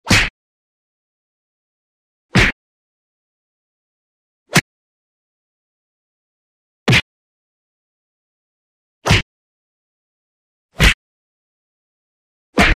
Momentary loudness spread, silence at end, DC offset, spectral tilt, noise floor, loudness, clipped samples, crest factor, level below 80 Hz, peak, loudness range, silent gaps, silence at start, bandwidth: 10 LU; 0 s; under 0.1%; -4 dB/octave; under -90 dBFS; -16 LUFS; under 0.1%; 22 dB; -30 dBFS; 0 dBFS; 5 LU; 0.30-2.29 s, 2.52-4.46 s, 4.61-6.86 s, 7.02-9.02 s, 9.22-10.69 s, 10.94-12.53 s; 0.05 s; 15.5 kHz